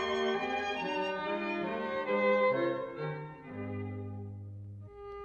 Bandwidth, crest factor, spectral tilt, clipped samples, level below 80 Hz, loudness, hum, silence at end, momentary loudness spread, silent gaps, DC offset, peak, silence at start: 8 kHz; 16 dB; -6 dB/octave; under 0.1%; -66 dBFS; -33 LUFS; none; 0 s; 17 LU; none; under 0.1%; -18 dBFS; 0 s